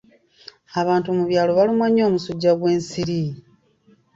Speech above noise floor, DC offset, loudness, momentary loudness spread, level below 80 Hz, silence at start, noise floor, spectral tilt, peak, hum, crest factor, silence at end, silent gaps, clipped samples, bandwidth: 38 dB; under 0.1%; -20 LUFS; 9 LU; -58 dBFS; 0.7 s; -57 dBFS; -6.5 dB/octave; -6 dBFS; none; 14 dB; 0.75 s; none; under 0.1%; 7.8 kHz